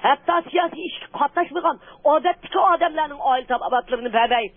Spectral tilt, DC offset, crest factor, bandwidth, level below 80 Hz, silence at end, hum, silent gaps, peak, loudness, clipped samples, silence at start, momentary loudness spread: -8 dB/octave; under 0.1%; 16 dB; 3.7 kHz; -56 dBFS; 0.1 s; none; none; -6 dBFS; -21 LUFS; under 0.1%; 0 s; 6 LU